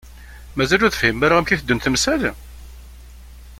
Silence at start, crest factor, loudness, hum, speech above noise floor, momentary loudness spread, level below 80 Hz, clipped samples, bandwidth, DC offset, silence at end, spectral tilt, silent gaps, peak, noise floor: 0.05 s; 20 dB; -18 LUFS; 60 Hz at -35 dBFS; 22 dB; 10 LU; -38 dBFS; under 0.1%; 16.5 kHz; under 0.1%; 0.05 s; -4 dB/octave; none; -2 dBFS; -40 dBFS